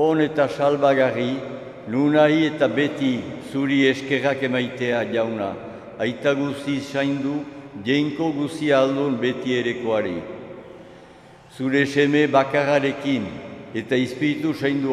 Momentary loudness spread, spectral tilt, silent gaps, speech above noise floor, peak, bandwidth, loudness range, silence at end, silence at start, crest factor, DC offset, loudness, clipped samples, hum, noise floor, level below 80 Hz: 13 LU; -6 dB/octave; none; 25 dB; -4 dBFS; 12 kHz; 4 LU; 0 s; 0 s; 18 dB; under 0.1%; -22 LUFS; under 0.1%; none; -46 dBFS; -62 dBFS